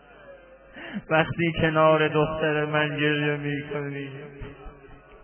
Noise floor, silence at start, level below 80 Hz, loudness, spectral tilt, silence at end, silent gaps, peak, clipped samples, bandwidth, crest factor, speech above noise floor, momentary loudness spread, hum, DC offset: -48 dBFS; 0.2 s; -50 dBFS; -24 LUFS; -10 dB/octave; 0.05 s; none; -8 dBFS; under 0.1%; 3.3 kHz; 18 dB; 24 dB; 20 LU; none; under 0.1%